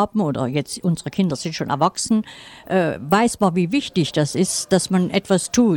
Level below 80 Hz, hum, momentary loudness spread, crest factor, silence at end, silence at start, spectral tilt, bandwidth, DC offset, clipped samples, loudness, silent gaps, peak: -52 dBFS; none; 5 LU; 16 dB; 0 s; 0 s; -5 dB/octave; 17.5 kHz; under 0.1%; under 0.1%; -20 LUFS; none; -4 dBFS